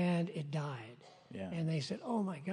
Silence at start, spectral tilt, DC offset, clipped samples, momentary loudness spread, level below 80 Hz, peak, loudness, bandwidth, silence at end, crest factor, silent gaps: 0 s; -7 dB/octave; under 0.1%; under 0.1%; 14 LU; -80 dBFS; -22 dBFS; -39 LUFS; 10.5 kHz; 0 s; 14 dB; none